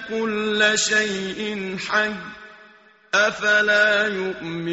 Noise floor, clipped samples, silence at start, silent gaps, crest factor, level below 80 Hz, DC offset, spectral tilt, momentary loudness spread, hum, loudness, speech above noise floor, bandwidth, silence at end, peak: -51 dBFS; under 0.1%; 0 s; none; 16 dB; -60 dBFS; under 0.1%; -1 dB/octave; 11 LU; none; -20 LUFS; 30 dB; 8 kHz; 0 s; -6 dBFS